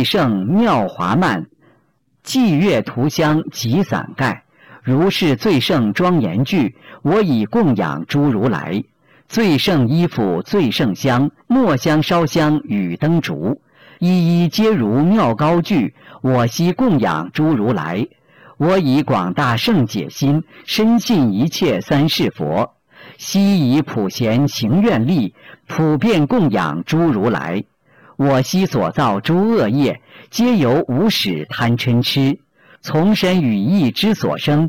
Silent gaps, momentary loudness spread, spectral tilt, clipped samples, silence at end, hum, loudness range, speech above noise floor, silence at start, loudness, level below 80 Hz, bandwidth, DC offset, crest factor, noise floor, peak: none; 7 LU; -6.5 dB/octave; under 0.1%; 0 s; none; 2 LU; 45 dB; 0 s; -16 LUFS; -50 dBFS; 17 kHz; 0.4%; 8 dB; -60 dBFS; -8 dBFS